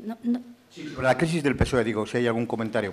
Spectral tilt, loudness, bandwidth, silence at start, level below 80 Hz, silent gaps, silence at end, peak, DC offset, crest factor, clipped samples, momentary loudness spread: -6 dB/octave; -26 LUFS; 13.5 kHz; 0 s; -42 dBFS; none; 0 s; -6 dBFS; under 0.1%; 18 dB; under 0.1%; 7 LU